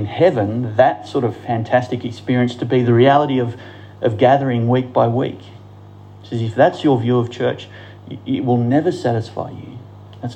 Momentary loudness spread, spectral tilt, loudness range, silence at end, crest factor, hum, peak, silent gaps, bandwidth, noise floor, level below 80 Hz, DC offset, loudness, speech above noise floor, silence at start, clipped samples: 18 LU; -8 dB/octave; 4 LU; 0 s; 16 dB; 50 Hz at -40 dBFS; -2 dBFS; none; 8.6 kHz; -39 dBFS; -60 dBFS; under 0.1%; -17 LUFS; 23 dB; 0 s; under 0.1%